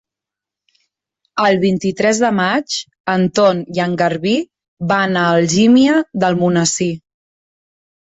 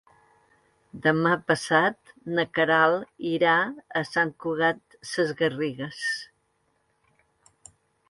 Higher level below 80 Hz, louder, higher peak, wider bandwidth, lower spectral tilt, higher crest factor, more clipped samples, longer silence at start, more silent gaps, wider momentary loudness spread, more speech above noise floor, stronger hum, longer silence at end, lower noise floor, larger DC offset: first, -56 dBFS vs -68 dBFS; first, -15 LUFS vs -25 LUFS; first, -2 dBFS vs -6 dBFS; second, 8.4 kHz vs 11.5 kHz; about the same, -5 dB/octave vs -5 dB/octave; second, 14 dB vs 20 dB; neither; first, 1.35 s vs 0.95 s; first, 3.00-3.04 s, 4.68-4.77 s vs none; about the same, 10 LU vs 9 LU; first, 71 dB vs 46 dB; neither; second, 1.1 s vs 1.85 s; first, -86 dBFS vs -71 dBFS; neither